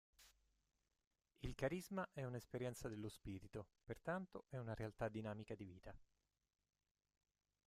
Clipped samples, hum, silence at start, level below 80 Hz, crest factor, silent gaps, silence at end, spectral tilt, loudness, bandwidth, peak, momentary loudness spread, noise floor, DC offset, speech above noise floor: under 0.1%; none; 0.2 s; -68 dBFS; 22 dB; 1.07-1.11 s; 1.65 s; -6.5 dB/octave; -50 LUFS; 15 kHz; -30 dBFS; 10 LU; -86 dBFS; under 0.1%; 37 dB